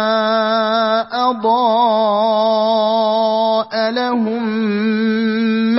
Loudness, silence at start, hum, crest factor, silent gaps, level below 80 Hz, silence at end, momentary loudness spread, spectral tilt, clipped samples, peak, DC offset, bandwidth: -15 LUFS; 0 s; none; 12 dB; none; -66 dBFS; 0 s; 4 LU; -9 dB/octave; under 0.1%; -4 dBFS; under 0.1%; 5.8 kHz